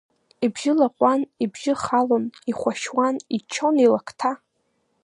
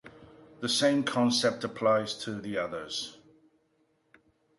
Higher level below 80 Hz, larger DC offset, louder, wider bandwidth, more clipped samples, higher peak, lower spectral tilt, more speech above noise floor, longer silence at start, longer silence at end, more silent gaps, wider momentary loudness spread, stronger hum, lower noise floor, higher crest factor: about the same, -66 dBFS vs -70 dBFS; neither; first, -22 LUFS vs -29 LUFS; about the same, 11 kHz vs 11.5 kHz; neither; first, -4 dBFS vs -12 dBFS; about the same, -4.5 dB/octave vs -3.5 dB/octave; first, 49 dB vs 43 dB; first, 0.4 s vs 0.05 s; second, 0.7 s vs 1.45 s; neither; about the same, 9 LU vs 10 LU; neither; about the same, -70 dBFS vs -71 dBFS; about the same, 18 dB vs 18 dB